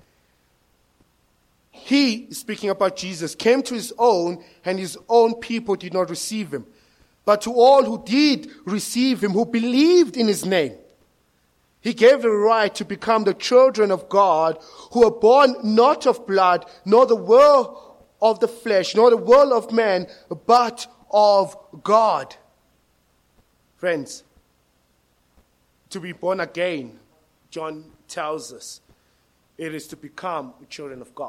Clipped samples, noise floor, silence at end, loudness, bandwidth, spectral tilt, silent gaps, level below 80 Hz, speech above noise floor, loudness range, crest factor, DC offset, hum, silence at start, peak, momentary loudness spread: under 0.1%; -64 dBFS; 0 s; -19 LUFS; 14.5 kHz; -4.5 dB/octave; none; -62 dBFS; 45 dB; 15 LU; 18 dB; under 0.1%; none; 1.85 s; -2 dBFS; 18 LU